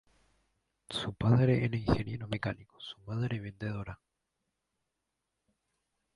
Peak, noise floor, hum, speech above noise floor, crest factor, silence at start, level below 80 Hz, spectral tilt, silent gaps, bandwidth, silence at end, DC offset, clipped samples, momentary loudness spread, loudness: -12 dBFS; -85 dBFS; none; 53 dB; 22 dB; 0.9 s; -54 dBFS; -7.5 dB/octave; none; 11.5 kHz; 2.2 s; under 0.1%; under 0.1%; 18 LU; -33 LUFS